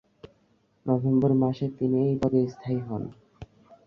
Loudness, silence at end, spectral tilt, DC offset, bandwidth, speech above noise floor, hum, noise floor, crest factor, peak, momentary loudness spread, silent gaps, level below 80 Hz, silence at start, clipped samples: -26 LUFS; 0.45 s; -10.5 dB/octave; under 0.1%; 6.6 kHz; 41 dB; none; -66 dBFS; 18 dB; -10 dBFS; 12 LU; none; -58 dBFS; 0.25 s; under 0.1%